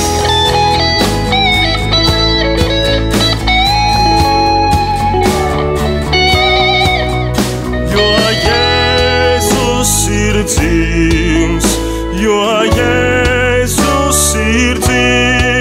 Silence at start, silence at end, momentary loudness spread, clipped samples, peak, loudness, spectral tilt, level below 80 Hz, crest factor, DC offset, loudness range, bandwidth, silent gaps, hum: 0 s; 0 s; 4 LU; under 0.1%; 0 dBFS; -11 LUFS; -4 dB/octave; -20 dBFS; 10 dB; under 0.1%; 1 LU; 16.5 kHz; none; none